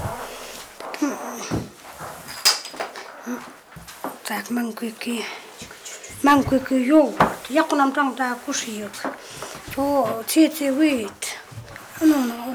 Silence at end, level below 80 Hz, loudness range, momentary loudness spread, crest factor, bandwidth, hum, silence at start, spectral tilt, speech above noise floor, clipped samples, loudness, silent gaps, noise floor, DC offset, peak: 0 s; -52 dBFS; 6 LU; 18 LU; 18 dB; over 20 kHz; none; 0 s; -3.5 dB/octave; 22 dB; under 0.1%; -22 LUFS; none; -42 dBFS; under 0.1%; -6 dBFS